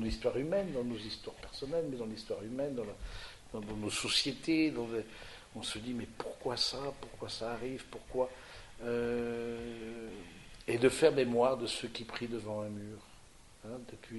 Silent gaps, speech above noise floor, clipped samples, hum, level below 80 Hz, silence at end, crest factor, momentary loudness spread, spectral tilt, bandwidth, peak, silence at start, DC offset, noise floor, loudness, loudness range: none; 21 dB; under 0.1%; none; -56 dBFS; 0 s; 24 dB; 17 LU; -4 dB/octave; 11.5 kHz; -12 dBFS; 0 s; under 0.1%; -57 dBFS; -36 LUFS; 6 LU